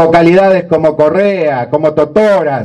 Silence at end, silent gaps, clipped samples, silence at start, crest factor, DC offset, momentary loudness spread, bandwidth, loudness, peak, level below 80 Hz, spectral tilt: 0 s; none; 0.7%; 0 s; 8 dB; under 0.1%; 6 LU; 9.8 kHz; -9 LUFS; 0 dBFS; -44 dBFS; -7.5 dB/octave